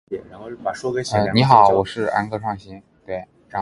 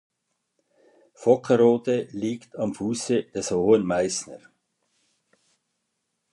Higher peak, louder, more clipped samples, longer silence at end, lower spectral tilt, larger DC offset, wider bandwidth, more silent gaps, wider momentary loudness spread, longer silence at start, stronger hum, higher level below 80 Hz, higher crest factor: first, 0 dBFS vs -4 dBFS; first, -18 LUFS vs -24 LUFS; neither; second, 0 s vs 1.95 s; about the same, -6 dB/octave vs -5 dB/octave; neither; about the same, 11.5 kHz vs 11 kHz; neither; first, 19 LU vs 11 LU; second, 0.1 s vs 1.2 s; neither; first, -50 dBFS vs -62 dBFS; about the same, 20 dB vs 20 dB